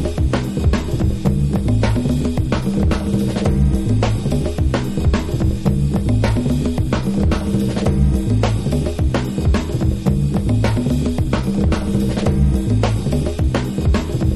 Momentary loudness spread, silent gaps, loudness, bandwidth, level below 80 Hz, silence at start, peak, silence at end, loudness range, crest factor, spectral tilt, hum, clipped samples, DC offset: 2 LU; none; -18 LUFS; 13 kHz; -22 dBFS; 0 s; -2 dBFS; 0 s; 1 LU; 14 dB; -7.5 dB/octave; none; under 0.1%; under 0.1%